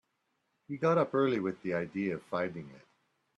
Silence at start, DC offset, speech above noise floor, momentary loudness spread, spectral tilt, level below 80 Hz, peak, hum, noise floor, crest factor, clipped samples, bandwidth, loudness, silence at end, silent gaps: 0.7 s; under 0.1%; 48 dB; 15 LU; -8 dB/octave; -74 dBFS; -16 dBFS; none; -80 dBFS; 18 dB; under 0.1%; 9.8 kHz; -32 LUFS; 0.6 s; none